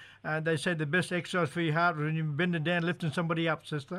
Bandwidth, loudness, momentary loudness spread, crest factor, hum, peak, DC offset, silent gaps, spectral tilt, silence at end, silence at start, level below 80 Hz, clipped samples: 12.5 kHz; -30 LUFS; 4 LU; 16 dB; none; -16 dBFS; under 0.1%; none; -6 dB/octave; 0 s; 0 s; -72 dBFS; under 0.1%